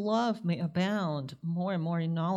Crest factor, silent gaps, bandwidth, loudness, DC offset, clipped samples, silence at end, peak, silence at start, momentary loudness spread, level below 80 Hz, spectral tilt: 12 dB; none; 8 kHz; -31 LUFS; under 0.1%; under 0.1%; 0 s; -18 dBFS; 0 s; 5 LU; -72 dBFS; -7.5 dB/octave